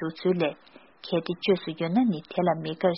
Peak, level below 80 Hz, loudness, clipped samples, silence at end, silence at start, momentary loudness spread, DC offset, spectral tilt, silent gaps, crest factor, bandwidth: -10 dBFS; -66 dBFS; -27 LUFS; under 0.1%; 0 s; 0 s; 5 LU; under 0.1%; -5.5 dB/octave; none; 16 dB; 5.8 kHz